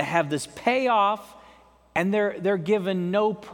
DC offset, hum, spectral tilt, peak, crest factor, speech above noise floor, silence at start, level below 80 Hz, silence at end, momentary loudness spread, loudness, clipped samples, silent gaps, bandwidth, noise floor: under 0.1%; none; -5.5 dB/octave; -6 dBFS; 18 dB; 30 dB; 0 s; -64 dBFS; 0 s; 6 LU; -24 LUFS; under 0.1%; none; 18 kHz; -54 dBFS